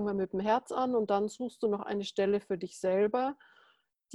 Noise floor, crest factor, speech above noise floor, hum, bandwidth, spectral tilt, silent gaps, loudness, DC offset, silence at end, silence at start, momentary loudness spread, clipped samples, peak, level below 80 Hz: -69 dBFS; 16 dB; 38 dB; none; 12 kHz; -6 dB/octave; none; -32 LUFS; under 0.1%; 0 s; 0 s; 7 LU; under 0.1%; -16 dBFS; -70 dBFS